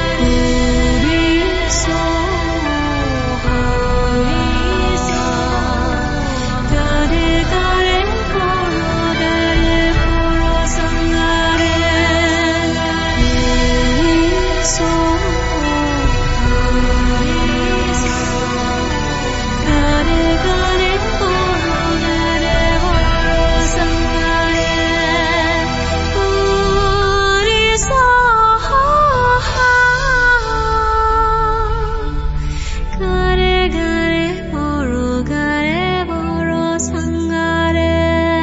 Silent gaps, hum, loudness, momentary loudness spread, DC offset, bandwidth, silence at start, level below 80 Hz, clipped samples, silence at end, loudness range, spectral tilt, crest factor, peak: none; none; -15 LUFS; 6 LU; under 0.1%; 8 kHz; 0 s; -20 dBFS; under 0.1%; 0 s; 4 LU; -4.5 dB/octave; 12 dB; -2 dBFS